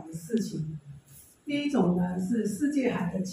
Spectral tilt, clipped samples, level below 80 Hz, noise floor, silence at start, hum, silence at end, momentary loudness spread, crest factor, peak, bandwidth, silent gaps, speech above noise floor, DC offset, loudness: -6.5 dB/octave; under 0.1%; -62 dBFS; -54 dBFS; 0 s; none; 0 s; 18 LU; 16 dB; -12 dBFS; 16 kHz; none; 26 dB; under 0.1%; -29 LUFS